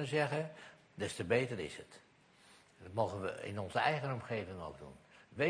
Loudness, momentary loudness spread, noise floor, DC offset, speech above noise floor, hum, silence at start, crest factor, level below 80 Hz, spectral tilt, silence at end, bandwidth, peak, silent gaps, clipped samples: -38 LUFS; 20 LU; -65 dBFS; under 0.1%; 27 dB; none; 0 s; 22 dB; -70 dBFS; -5.5 dB/octave; 0 s; 10.5 kHz; -18 dBFS; none; under 0.1%